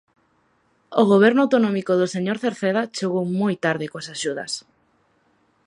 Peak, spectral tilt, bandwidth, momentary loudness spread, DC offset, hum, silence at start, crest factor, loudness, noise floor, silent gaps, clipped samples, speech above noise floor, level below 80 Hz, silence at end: -2 dBFS; -5.5 dB/octave; 11 kHz; 13 LU; under 0.1%; none; 0.9 s; 20 dB; -21 LUFS; -64 dBFS; none; under 0.1%; 44 dB; -70 dBFS; 1.05 s